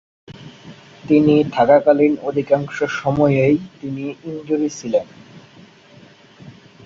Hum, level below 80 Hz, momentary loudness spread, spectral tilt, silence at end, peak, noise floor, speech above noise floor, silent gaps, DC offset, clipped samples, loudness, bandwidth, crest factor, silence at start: none; -54 dBFS; 17 LU; -7 dB/octave; 0.35 s; -2 dBFS; -46 dBFS; 29 dB; none; under 0.1%; under 0.1%; -17 LUFS; 7.6 kHz; 16 dB; 0.3 s